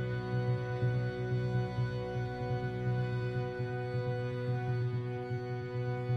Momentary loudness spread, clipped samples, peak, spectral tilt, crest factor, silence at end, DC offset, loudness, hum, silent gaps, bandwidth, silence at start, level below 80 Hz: 4 LU; under 0.1%; -22 dBFS; -8.5 dB/octave; 12 dB; 0 s; under 0.1%; -35 LUFS; none; none; 6.2 kHz; 0 s; -56 dBFS